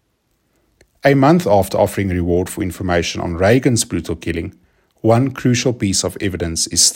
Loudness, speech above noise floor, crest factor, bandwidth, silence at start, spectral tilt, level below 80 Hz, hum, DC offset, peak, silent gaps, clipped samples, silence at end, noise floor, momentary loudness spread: -16 LUFS; 49 dB; 16 dB; 16.5 kHz; 1.05 s; -4.5 dB/octave; -44 dBFS; none; under 0.1%; 0 dBFS; none; under 0.1%; 0 s; -65 dBFS; 10 LU